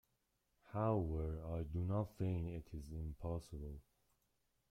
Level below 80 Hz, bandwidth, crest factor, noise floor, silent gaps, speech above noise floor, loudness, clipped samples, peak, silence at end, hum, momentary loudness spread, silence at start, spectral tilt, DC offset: -54 dBFS; 13 kHz; 18 dB; -84 dBFS; none; 42 dB; -43 LUFS; under 0.1%; -26 dBFS; 0.9 s; none; 12 LU; 0.65 s; -9.5 dB/octave; under 0.1%